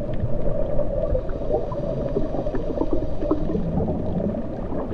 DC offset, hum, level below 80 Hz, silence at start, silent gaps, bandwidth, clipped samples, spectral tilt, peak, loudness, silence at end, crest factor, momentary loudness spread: under 0.1%; none; -28 dBFS; 0 s; none; 4.9 kHz; under 0.1%; -10.5 dB/octave; -6 dBFS; -26 LUFS; 0 s; 16 dB; 3 LU